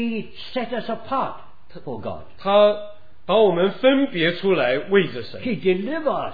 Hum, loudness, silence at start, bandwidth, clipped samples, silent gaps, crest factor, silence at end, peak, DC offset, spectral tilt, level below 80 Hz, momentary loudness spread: none; -21 LUFS; 0 s; 5 kHz; under 0.1%; none; 18 dB; 0 s; -4 dBFS; 2%; -8.5 dB/octave; -58 dBFS; 15 LU